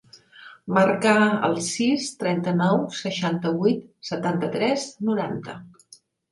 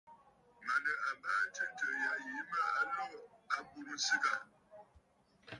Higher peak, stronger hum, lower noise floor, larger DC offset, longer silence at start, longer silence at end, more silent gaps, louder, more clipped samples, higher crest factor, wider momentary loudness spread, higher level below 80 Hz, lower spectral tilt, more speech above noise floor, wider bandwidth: first, -6 dBFS vs -20 dBFS; neither; second, -54 dBFS vs -70 dBFS; neither; about the same, 0.15 s vs 0.1 s; first, 0.65 s vs 0 s; neither; first, -23 LUFS vs -37 LUFS; neither; about the same, 18 dB vs 18 dB; about the same, 12 LU vs 12 LU; first, -66 dBFS vs -80 dBFS; first, -5 dB/octave vs -0.5 dB/octave; about the same, 31 dB vs 32 dB; about the same, 11.5 kHz vs 11.5 kHz